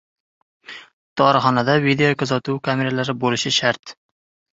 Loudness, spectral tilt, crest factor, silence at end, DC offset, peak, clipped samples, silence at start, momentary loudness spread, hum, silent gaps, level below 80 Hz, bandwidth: -19 LUFS; -4.5 dB/octave; 18 dB; 0.65 s; under 0.1%; -2 dBFS; under 0.1%; 0.7 s; 20 LU; none; 0.93-1.16 s, 3.79-3.83 s; -60 dBFS; 7.8 kHz